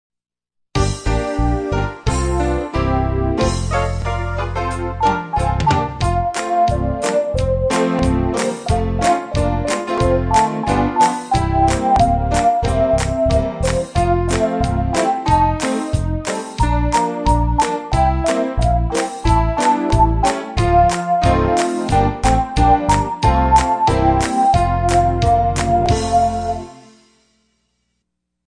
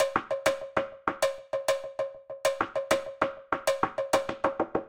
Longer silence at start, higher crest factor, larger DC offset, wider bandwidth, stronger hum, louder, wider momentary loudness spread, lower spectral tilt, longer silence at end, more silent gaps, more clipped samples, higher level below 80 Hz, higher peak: first, 0.75 s vs 0 s; second, 16 dB vs 22 dB; neither; second, 10.5 kHz vs 16.5 kHz; neither; first, -17 LUFS vs -30 LUFS; about the same, 6 LU vs 4 LU; first, -6 dB/octave vs -3 dB/octave; first, 1.7 s vs 0 s; neither; neither; first, -24 dBFS vs -62 dBFS; first, -2 dBFS vs -8 dBFS